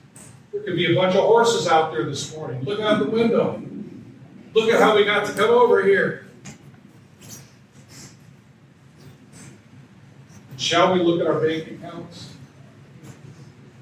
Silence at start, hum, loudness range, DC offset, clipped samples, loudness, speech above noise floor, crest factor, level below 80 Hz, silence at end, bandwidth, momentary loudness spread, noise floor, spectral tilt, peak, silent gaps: 0.15 s; none; 6 LU; under 0.1%; under 0.1%; -19 LUFS; 31 dB; 18 dB; -64 dBFS; 0.35 s; 15 kHz; 25 LU; -50 dBFS; -4.5 dB/octave; -4 dBFS; none